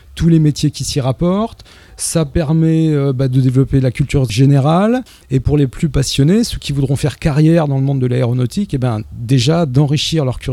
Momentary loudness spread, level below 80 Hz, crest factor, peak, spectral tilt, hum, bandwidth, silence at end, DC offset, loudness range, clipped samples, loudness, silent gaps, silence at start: 7 LU; -32 dBFS; 14 dB; 0 dBFS; -6.5 dB/octave; none; 13.5 kHz; 0 s; under 0.1%; 2 LU; under 0.1%; -14 LUFS; none; 0.15 s